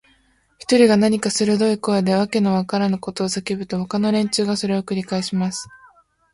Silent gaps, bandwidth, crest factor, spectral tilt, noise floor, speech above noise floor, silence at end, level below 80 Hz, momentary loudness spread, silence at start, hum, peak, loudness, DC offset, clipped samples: none; 11.5 kHz; 18 dB; -5 dB/octave; -60 dBFS; 41 dB; 0.7 s; -58 dBFS; 10 LU; 0.7 s; none; -2 dBFS; -19 LUFS; under 0.1%; under 0.1%